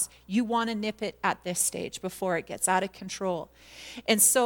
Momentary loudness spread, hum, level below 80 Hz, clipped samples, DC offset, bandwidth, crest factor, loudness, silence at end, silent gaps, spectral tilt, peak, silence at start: 9 LU; none; -62 dBFS; under 0.1%; under 0.1%; 19 kHz; 20 dB; -28 LUFS; 0 s; none; -2.5 dB/octave; -8 dBFS; 0 s